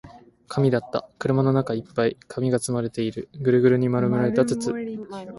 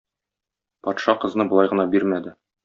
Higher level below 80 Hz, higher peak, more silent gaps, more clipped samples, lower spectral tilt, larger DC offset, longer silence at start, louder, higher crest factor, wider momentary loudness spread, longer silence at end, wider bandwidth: first, -58 dBFS vs -66 dBFS; about the same, -6 dBFS vs -4 dBFS; neither; neither; first, -7 dB/octave vs -4.5 dB/octave; neither; second, 0.05 s vs 0.85 s; about the same, -23 LUFS vs -21 LUFS; about the same, 18 dB vs 20 dB; about the same, 10 LU vs 11 LU; second, 0 s vs 0.3 s; first, 11.5 kHz vs 7.2 kHz